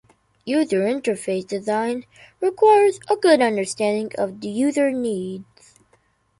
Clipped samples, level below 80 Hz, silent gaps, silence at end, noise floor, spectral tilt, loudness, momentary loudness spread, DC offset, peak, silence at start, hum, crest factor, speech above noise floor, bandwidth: under 0.1%; -66 dBFS; none; 1 s; -62 dBFS; -5 dB/octave; -20 LUFS; 11 LU; under 0.1%; -4 dBFS; 0.45 s; none; 16 dB; 42 dB; 11.5 kHz